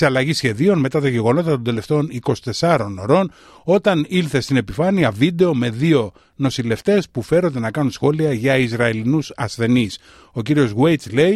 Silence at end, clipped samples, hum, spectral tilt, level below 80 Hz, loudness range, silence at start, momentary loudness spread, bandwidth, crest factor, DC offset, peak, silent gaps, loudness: 0 s; under 0.1%; none; -6.5 dB/octave; -50 dBFS; 1 LU; 0 s; 6 LU; 13 kHz; 16 dB; under 0.1%; -2 dBFS; none; -18 LUFS